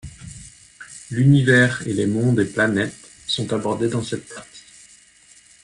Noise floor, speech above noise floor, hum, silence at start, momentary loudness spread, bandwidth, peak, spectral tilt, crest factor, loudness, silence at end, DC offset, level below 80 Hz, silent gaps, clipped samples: -51 dBFS; 32 dB; none; 0.05 s; 23 LU; 11.5 kHz; -4 dBFS; -6 dB/octave; 18 dB; -20 LUFS; 1.05 s; under 0.1%; -52 dBFS; none; under 0.1%